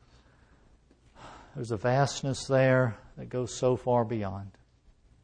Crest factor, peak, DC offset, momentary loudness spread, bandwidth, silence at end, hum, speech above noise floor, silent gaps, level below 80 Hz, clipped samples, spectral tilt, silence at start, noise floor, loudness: 18 dB; -14 dBFS; under 0.1%; 20 LU; 9.6 kHz; 0.75 s; none; 33 dB; none; -58 dBFS; under 0.1%; -6 dB/octave; 1.2 s; -61 dBFS; -28 LUFS